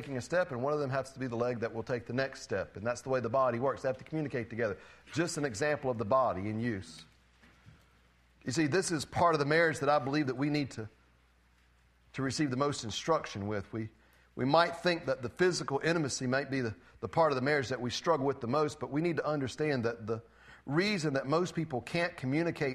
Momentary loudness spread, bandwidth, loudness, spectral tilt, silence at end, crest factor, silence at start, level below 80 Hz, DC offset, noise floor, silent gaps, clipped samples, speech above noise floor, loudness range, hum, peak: 10 LU; 13.5 kHz; -32 LUFS; -5 dB/octave; 0 s; 22 dB; 0 s; -64 dBFS; under 0.1%; -66 dBFS; none; under 0.1%; 34 dB; 4 LU; none; -10 dBFS